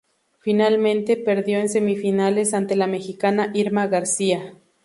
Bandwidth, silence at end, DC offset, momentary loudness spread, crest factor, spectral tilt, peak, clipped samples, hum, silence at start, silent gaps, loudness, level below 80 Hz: 11.5 kHz; 0.3 s; under 0.1%; 5 LU; 16 dB; -4.5 dB/octave; -6 dBFS; under 0.1%; none; 0.45 s; none; -21 LUFS; -68 dBFS